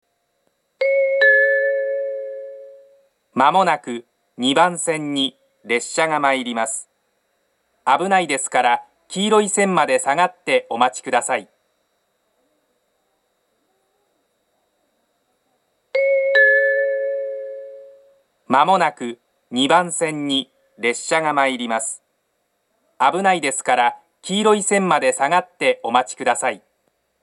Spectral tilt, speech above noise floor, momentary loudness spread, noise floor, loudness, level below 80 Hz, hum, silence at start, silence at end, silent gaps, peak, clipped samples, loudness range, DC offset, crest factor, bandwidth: -3 dB/octave; 51 dB; 14 LU; -70 dBFS; -18 LUFS; -78 dBFS; none; 0.8 s; 0.65 s; none; 0 dBFS; under 0.1%; 4 LU; under 0.1%; 20 dB; 12 kHz